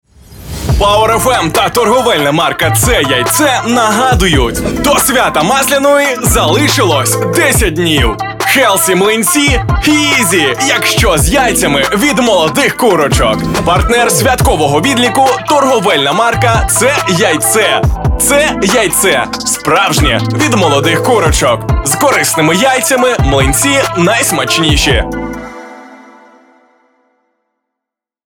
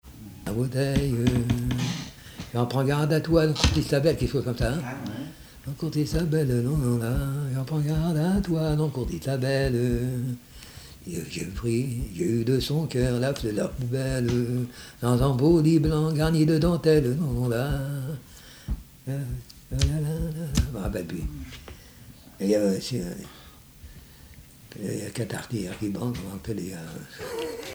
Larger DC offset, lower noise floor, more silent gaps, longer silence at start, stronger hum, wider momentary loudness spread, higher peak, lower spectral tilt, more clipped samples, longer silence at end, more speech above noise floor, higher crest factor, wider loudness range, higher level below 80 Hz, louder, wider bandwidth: neither; first, -81 dBFS vs -49 dBFS; neither; first, 0.3 s vs 0.05 s; neither; second, 3 LU vs 16 LU; first, 0 dBFS vs -6 dBFS; second, -3.5 dB/octave vs -6.5 dB/octave; neither; first, 2.3 s vs 0 s; first, 71 dB vs 24 dB; second, 10 dB vs 20 dB; second, 1 LU vs 8 LU; first, -22 dBFS vs -38 dBFS; first, -9 LUFS vs -26 LUFS; second, 17.5 kHz vs over 20 kHz